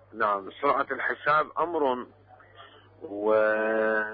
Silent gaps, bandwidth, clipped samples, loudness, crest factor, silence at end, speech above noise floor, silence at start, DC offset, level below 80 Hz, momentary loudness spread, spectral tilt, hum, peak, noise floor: none; 5.2 kHz; under 0.1%; -26 LUFS; 16 dB; 0 s; 25 dB; 0.15 s; under 0.1%; -68 dBFS; 10 LU; -8.5 dB/octave; none; -12 dBFS; -52 dBFS